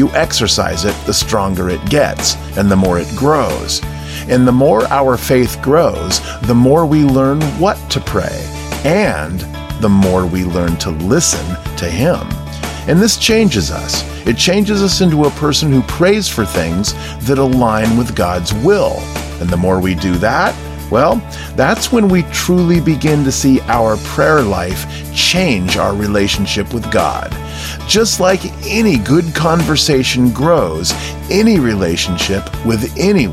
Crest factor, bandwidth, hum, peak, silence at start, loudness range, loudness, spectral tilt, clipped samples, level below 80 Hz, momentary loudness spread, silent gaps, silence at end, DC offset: 12 dB; 16 kHz; none; 0 dBFS; 0 s; 2 LU; -13 LUFS; -4.5 dB/octave; under 0.1%; -30 dBFS; 8 LU; none; 0 s; under 0.1%